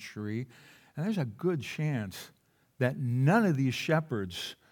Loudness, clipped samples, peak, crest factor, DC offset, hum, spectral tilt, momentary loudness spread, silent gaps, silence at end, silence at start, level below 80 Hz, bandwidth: -31 LUFS; under 0.1%; -12 dBFS; 18 dB; under 0.1%; none; -6.5 dB/octave; 15 LU; none; 0.15 s; 0 s; -76 dBFS; 18 kHz